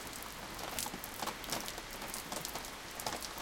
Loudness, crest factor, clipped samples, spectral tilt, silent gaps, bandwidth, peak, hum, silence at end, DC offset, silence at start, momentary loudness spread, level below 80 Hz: -41 LUFS; 26 dB; under 0.1%; -1.5 dB/octave; none; 17 kHz; -18 dBFS; none; 0 s; under 0.1%; 0 s; 5 LU; -58 dBFS